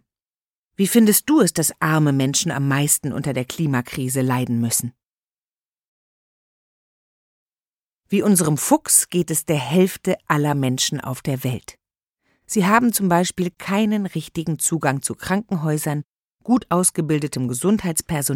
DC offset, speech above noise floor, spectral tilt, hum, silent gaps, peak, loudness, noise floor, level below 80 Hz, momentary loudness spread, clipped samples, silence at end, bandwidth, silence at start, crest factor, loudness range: under 0.1%; over 70 dB; -4.5 dB/octave; none; 5.06-7.50 s, 7.68-7.77 s, 7.83-7.87 s, 7.94-7.99 s, 16.06-16.16 s, 16.24-16.31 s; -2 dBFS; -20 LUFS; under -90 dBFS; -56 dBFS; 10 LU; under 0.1%; 0 s; 17 kHz; 0.8 s; 20 dB; 7 LU